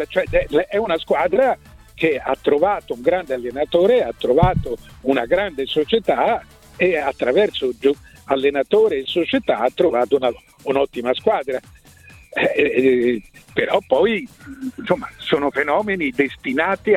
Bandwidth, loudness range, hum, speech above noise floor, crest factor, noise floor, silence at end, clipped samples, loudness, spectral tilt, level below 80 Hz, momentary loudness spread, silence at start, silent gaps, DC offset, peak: 14.5 kHz; 2 LU; none; 27 dB; 18 dB; -46 dBFS; 0 s; under 0.1%; -19 LUFS; -6.5 dB/octave; -42 dBFS; 9 LU; 0 s; none; under 0.1%; 0 dBFS